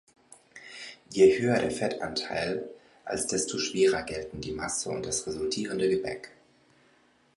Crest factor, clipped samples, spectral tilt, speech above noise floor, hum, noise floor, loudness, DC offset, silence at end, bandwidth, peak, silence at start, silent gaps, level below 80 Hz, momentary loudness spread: 20 dB; under 0.1%; -3.5 dB/octave; 36 dB; none; -64 dBFS; -28 LUFS; under 0.1%; 1.1 s; 11.5 kHz; -8 dBFS; 0.55 s; none; -58 dBFS; 20 LU